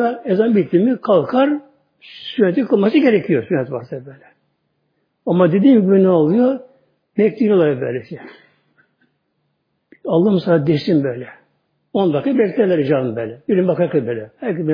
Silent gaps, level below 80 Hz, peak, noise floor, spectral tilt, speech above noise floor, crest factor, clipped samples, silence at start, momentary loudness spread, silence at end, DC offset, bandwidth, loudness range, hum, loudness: none; -64 dBFS; 0 dBFS; -69 dBFS; -10 dB/octave; 53 dB; 16 dB; under 0.1%; 0 s; 14 LU; 0 s; under 0.1%; 5.2 kHz; 5 LU; none; -16 LUFS